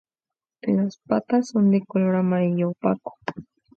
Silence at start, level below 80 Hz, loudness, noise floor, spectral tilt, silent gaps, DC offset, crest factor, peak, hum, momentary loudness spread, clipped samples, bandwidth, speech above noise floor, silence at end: 0.65 s; -66 dBFS; -23 LUFS; under -90 dBFS; -8.5 dB/octave; none; under 0.1%; 18 dB; -6 dBFS; none; 14 LU; under 0.1%; 7.6 kHz; over 68 dB; 0.35 s